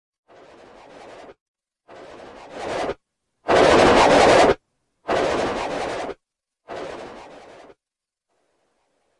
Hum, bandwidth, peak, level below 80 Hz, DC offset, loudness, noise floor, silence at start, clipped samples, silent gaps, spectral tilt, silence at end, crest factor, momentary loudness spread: none; 11.5 kHz; -2 dBFS; -46 dBFS; under 0.1%; -18 LUFS; -88 dBFS; 1.05 s; under 0.1%; 1.41-1.54 s; -4 dB/octave; 1.95 s; 20 dB; 26 LU